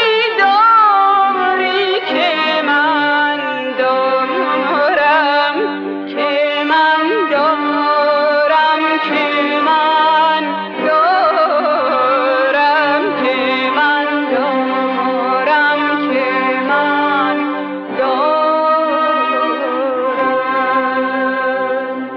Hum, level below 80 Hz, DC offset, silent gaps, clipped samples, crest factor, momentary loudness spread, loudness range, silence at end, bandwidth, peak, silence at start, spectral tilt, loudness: none; -64 dBFS; under 0.1%; none; under 0.1%; 12 dB; 5 LU; 2 LU; 0 s; 6.8 kHz; -2 dBFS; 0 s; -5 dB/octave; -14 LUFS